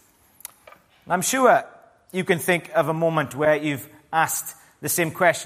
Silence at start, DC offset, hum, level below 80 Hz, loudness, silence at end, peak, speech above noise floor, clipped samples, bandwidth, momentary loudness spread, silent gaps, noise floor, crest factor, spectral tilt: 1.1 s; under 0.1%; none; -66 dBFS; -22 LUFS; 0 s; -2 dBFS; 30 dB; under 0.1%; 15.5 kHz; 16 LU; none; -52 dBFS; 20 dB; -4 dB/octave